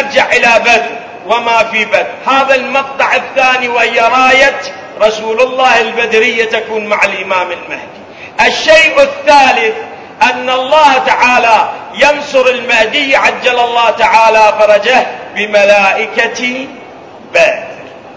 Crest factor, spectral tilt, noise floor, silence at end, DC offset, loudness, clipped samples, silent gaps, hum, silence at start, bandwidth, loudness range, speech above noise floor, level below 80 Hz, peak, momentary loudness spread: 10 dB; -2 dB/octave; -31 dBFS; 0 s; under 0.1%; -8 LUFS; 2%; none; none; 0 s; 8 kHz; 3 LU; 22 dB; -46 dBFS; 0 dBFS; 12 LU